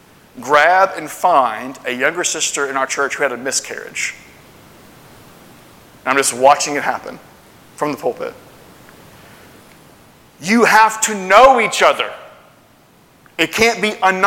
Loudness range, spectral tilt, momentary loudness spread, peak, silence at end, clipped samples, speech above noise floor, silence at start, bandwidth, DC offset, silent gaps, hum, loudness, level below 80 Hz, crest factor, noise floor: 10 LU; -2 dB/octave; 16 LU; 0 dBFS; 0 s; under 0.1%; 34 dB; 0.35 s; 17.5 kHz; under 0.1%; none; none; -15 LUFS; -52 dBFS; 18 dB; -49 dBFS